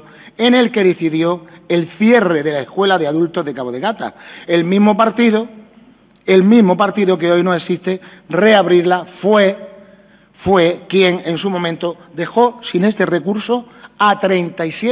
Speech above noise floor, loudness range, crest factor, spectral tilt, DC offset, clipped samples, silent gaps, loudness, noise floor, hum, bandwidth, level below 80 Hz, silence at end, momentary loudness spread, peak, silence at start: 33 dB; 3 LU; 14 dB; -10 dB/octave; under 0.1%; under 0.1%; none; -14 LUFS; -46 dBFS; none; 4 kHz; -56 dBFS; 0 s; 11 LU; 0 dBFS; 0.25 s